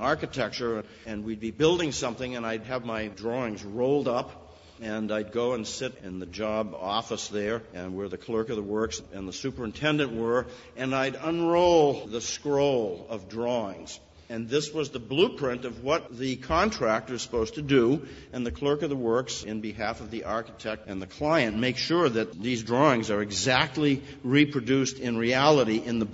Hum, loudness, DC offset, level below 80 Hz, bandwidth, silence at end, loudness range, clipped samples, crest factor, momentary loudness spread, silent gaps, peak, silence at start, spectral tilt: none; -28 LUFS; under 0.1%; -52 dBFS; 8 kHz; 0 s; 6 LU; under 0.1%; 22 dB; 12 LU; none; -4 dBFS; 0 s; -5 dB/octave